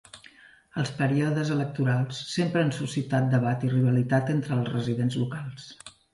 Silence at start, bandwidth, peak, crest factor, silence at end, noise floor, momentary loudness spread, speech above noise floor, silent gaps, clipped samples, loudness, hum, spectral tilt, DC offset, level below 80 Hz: 0.15 s; 11.5 kHz; -12 dBFS; 16 dB; 0.25 s; -53 dBFS; 12 LU; 28 dB; none; under 0.1%; -26 LUFS; none; -7 dB/octave; under 0.1%; -62 dBFS